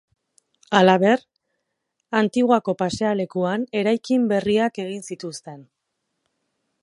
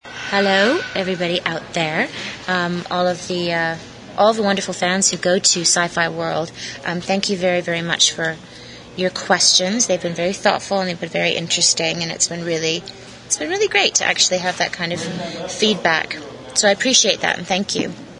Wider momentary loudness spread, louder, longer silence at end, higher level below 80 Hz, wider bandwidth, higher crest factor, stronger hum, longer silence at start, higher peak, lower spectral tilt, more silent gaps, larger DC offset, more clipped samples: first, 15 LU vs 11 LU; second, -21 LUFS vs -18 LUFS; first, 1.2 s vs 0 s; second, -62 dBFS vs -56 dBFS; about the same, 11.5 kHz vs 11 kHz; about the same, 22 dB vs 20 dB; neither; first, 0.7 s vs 0.05 s; about the same, 0 dBFS vs 0 dBFS; first, -5.5 dB/octave vs -2 dB/octave; neither; neither; neither